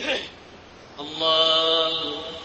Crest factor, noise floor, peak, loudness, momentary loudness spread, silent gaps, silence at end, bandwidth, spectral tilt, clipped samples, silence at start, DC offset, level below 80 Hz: 18 dB; -45 dBFS; -8 dBFS; -20 LUFS; 18 LU; none; 0 s; 8.4 kHz; -2.5 dB/octave; under 0.1%; 0 s; under 0.1%; -60 dBFS